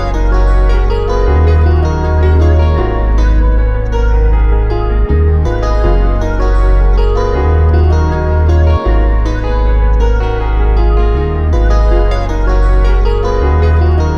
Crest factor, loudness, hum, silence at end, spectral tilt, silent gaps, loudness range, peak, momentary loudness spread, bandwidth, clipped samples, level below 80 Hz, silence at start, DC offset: 8 dB; -12 LUFS; none; 0 s; -8 dB/octave; none; 1 LU; 0 dBFS; 4 LU; 6.4 kHz; under 0.1%; -10 dBFS; 0 s; under 0.1%